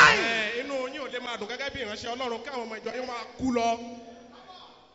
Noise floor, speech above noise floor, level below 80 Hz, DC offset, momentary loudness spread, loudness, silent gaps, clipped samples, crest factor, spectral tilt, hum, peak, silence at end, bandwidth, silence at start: -50 dBFS; 18 dB; -58 dBFS; under 0.1%; 21 LU; -29 LUFS; none; under 0.1%; 24 dB; -0.5 dB/octave; none; -6 dBFS; 0.2 s; 8 kHz; 0 s